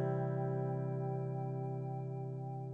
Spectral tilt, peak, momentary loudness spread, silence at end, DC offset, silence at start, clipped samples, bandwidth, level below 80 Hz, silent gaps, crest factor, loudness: -11.5 dB/octave; -26 dBFS; 6 LU; 0 s; under 0.1%; 0 s; under 0.1%; 2.5 kHz; -74 dBFS; none; 12 dB; -39 LUFS